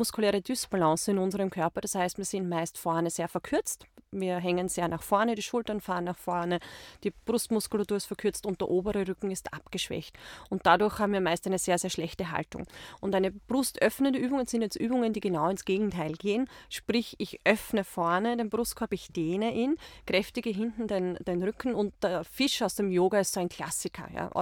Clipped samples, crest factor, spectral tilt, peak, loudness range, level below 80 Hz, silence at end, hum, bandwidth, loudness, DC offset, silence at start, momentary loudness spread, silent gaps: under 0.1%; 22 dB; -4.5 dB/octave; -8 dBFS; 2 LU; -58 dBFS; 0 s; none; 18.5 kHz; -30 LUFS; under 0.1%; 0 s; 8 LU; none